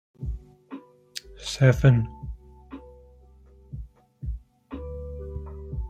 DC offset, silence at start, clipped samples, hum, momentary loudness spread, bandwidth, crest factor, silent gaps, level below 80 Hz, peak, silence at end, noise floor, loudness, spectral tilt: under 0.1%; 0.2 s; under 0.1%; none; 25 LU; 9.4 kHz; 24 dB; none; -40 dBFS; -6 dBFS; 0 s; -52 dBFS; -26 LUFS; -6.5 dB/octave